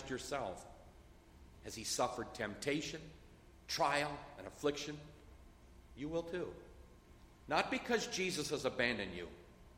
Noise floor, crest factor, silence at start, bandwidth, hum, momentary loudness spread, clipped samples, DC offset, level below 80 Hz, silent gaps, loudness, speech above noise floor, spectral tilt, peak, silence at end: -61 dBFS; 24 dB; 0 s; 16 kHz; none; 22 LU; under 0.1%; under 0.1%; -62 dBFS; none; -39 LUFS; 21 dB; -3.5 dB/octave; -18 dBFS; 0 s